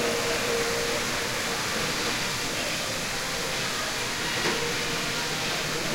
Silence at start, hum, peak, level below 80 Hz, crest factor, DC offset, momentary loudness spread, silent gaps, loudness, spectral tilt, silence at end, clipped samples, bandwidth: 0 s; none; -14 dBFS; -48 dBFS; 14 dB; under 0.1%; 2 LU; none; -26 LUFS; -2 dB/octave; 0 s; under 0.1%; 16 kHz